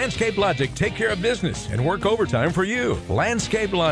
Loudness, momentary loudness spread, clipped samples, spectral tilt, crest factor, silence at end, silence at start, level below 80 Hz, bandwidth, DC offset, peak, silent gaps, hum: -22 LUFS; 3 LU; under 0.1%; -5 dB/octave; 14 dB; 0 s; 0 s; -40 dBFS; 11 kHz; under 0.1%; -8 dBFS; none; none